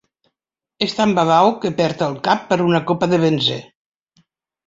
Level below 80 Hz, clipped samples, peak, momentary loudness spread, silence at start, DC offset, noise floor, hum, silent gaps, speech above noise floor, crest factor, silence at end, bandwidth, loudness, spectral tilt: -58 dBFS; under 0.1%; -2 dBFS; 7 LU; 0.8 s; under 0.1%; -83 dBFS; none; none; 67 dB; 18 dB; 1.05 s; 7.8 kHz; -17 LUFS; -6 dB/octave